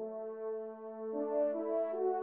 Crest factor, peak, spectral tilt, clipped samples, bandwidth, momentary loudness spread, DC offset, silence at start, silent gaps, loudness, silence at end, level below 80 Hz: 14 dB; -24 dBFS; -7 dB/octave; under 0.1%; 3.2 kHz; 9 LU; under 0.1%; 0 s; none; -37 LUFS; 0 s; under -90 dBFS